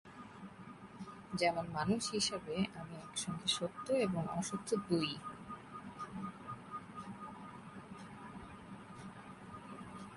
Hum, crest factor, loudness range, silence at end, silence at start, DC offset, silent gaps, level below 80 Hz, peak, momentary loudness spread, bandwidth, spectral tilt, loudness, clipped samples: none; 22 dB; 13 LU; 0 s; 0.05 s; under 0.1%; none; -68 dBFS; -20 dBFS; 17 LU; 11.5 kHz; -4 dB/octave; -39 LUFS; under 0.1%